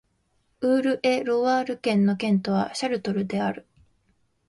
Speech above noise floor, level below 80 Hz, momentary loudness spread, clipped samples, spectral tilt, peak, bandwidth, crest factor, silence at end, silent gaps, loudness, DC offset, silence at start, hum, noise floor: 46 dB; -64 dBFS; 6 LU; under 0.1%; -6 dB/octave; -10 dBFS; 11.5 kHz; 14 dB; 0.9 s; none; -24 LUFS; under 0.1%; 0.6 s; none; -69 dBFS